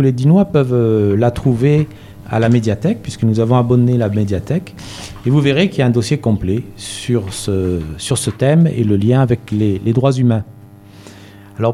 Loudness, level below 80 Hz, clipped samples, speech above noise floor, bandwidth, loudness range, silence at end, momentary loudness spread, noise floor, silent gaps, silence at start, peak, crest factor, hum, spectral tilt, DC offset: -15 LUFS; -40 dBFS; under 0.1%; 25 dB; 13.5 kHz; 2 LU; 0 s; 9 LU; -39 dBFS; none; 0 s; 0 dBFS; 14 dB; none; -7 dB/octave; under 0.1%